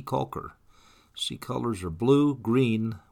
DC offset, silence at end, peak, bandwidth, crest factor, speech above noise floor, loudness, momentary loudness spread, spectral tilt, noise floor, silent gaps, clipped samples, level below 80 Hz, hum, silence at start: under 0.1%; 0.15 s; -10 dBFS; 15.5 kHz; 18 dB; 31 dB; -27 LUFS; 15 LU; -6.5 dB/octave; -57 dBFS; none; under 0.1%; -56 dBFS; none; 0 s